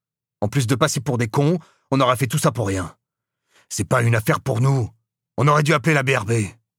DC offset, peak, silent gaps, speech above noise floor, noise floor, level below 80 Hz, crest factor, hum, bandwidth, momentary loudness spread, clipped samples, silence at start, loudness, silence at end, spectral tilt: under 0.1%; -2 dBFS; none; 62 dB; -81 dBFS; -54 dBFS; 18 dB; none; 16.5 kHz; 10 LU; under 0.1%; 0.4 s; -20 LUFS; 0.25 s; -5.5 dB/octave